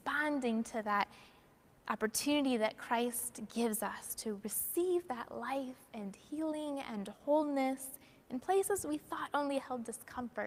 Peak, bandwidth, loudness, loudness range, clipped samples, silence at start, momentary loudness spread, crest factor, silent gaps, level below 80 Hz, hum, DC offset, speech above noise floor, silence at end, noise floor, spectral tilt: -16 dBFS; 16 kHz; -37 LUFS; 3 LU; under 0.1%; 0.05 s; 11 LU; 22 dB; none; -72 dBFS; none; under 0.1%; 28 dB; 0 s; -65 dBFS; -3 dB/octave